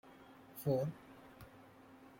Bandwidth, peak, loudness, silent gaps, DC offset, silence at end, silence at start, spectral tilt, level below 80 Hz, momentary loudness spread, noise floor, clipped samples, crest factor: 16.5 kHz; -22 dBFS; -39 LUFS; none; under 0.1%; 0.1 s; 0.05 s; -7.5 dB/octave; -72 dBFS; 23 LU; -60 dBFS; under 0.1%; 22 dB